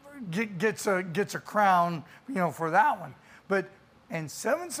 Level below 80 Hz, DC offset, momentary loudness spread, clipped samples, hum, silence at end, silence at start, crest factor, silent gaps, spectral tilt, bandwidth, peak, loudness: -72 dBFS; under 0.1%; 13 LU; under 0.1%; none; 0 s; 0.05 s; 18 dB; none; -5 dB/octave; 15.5 kHz; -10 dBFS; -28 LUFS